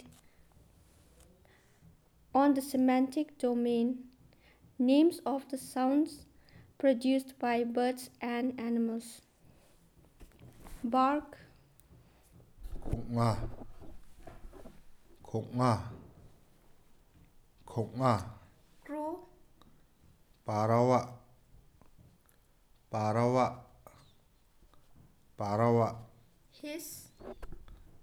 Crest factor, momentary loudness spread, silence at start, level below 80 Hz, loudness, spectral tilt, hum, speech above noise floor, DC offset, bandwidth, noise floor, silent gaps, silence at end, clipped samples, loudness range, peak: 20 dB; 22 LU; 0.05 s; -56 dBFS; -32 LUFS; -7 dB/octave; none; 35 dB; under 0.1%; 19 kHz; -66 dBFS; none; 0.05 s; under 0.1%; 8 LU; -14 dBFS